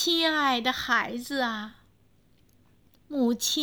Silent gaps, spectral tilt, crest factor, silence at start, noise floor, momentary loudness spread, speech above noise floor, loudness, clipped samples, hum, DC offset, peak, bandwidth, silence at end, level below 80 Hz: none; -1.5 dB/octave; 18 dB; 0 s; -63 dBFS; 12 LU; 37 dB; -26 LUFS; under 0.1%; none; under 0.1%; -10 dBFS; over 20 kHz; 0 s; -64 dBFS